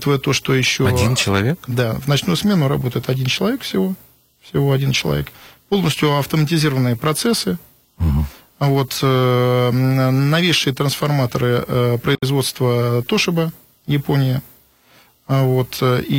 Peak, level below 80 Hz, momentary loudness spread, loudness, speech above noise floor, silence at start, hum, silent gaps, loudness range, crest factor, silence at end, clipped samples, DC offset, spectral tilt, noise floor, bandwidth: -4 dBFS; -40 dBFS; 6 LU; -18 LUFS; 35 dB; 0 s; none; none; 3 LU; 12 dB; 0 s; under 0.1%; under 0.1%; -5.5 dB/octave; -52 dBFS; 17 kHz